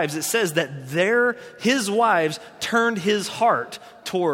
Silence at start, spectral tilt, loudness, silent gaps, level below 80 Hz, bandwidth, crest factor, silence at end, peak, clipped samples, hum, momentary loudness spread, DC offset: 0 s; -3.5 dB/octave; -22 LUFS; none; -68 dBFS; 16.5 kHz; 16 dB; 0 s; -6 dBFS; under 0.1%; none; 8 LU; under 0.1%